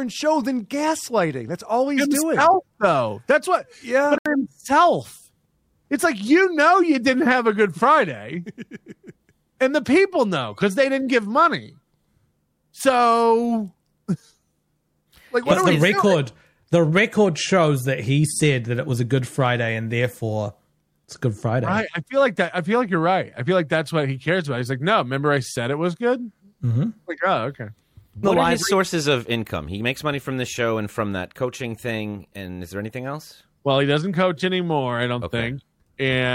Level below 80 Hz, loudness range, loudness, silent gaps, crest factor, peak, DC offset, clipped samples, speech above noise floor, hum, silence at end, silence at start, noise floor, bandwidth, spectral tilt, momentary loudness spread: -56 dBFS; 5 LU; -21 LUFS; 4.19-4.25 s; 18 dB; -4 dBFS; under 0.1%; under 0.1%; 49 dB; none; 0 s; 0 s; -69 dBFS; 16.5 kHz; -5.5 dB/octave; 13 LU